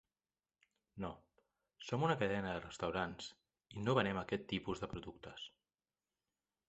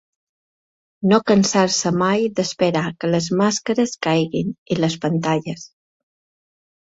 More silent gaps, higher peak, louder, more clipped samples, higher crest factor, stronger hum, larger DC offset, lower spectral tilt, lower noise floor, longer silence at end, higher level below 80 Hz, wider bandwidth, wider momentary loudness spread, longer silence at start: second, none vs 4.58-4.66 s; second, -18 dBFS vs -2 dBFS; second, -40 LUFS vs -19 LUFS; neither; first, 26 dB vs 18 dB; neither; neither; about the same, -4.5 dB/octave vs -5 dB/octave; about the same, under -90 dBFS vs under -90 dBFS; about the same, 1.2 s vs 1.2 s; second, -66 dBFS vs -58 dBFS; about the same, 8 kHz vs 8 kHz; first, 17 LU vs 8 LU; about the same, 0.95 s vs 1 s